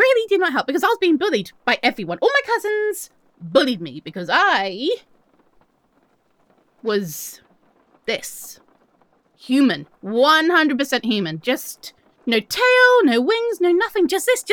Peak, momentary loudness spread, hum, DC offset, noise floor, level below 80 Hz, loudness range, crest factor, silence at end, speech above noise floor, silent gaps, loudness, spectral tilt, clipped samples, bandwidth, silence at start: -2 dBFS; 17 LU; none; under 0.1%; -62 dBFS; -68 dBFS; 12 LU; 18 dB; 0 s; 43 dB; none; -18 LUFS; -3.5 dB/octave; under 0.1%; over 20 kHz; 0 s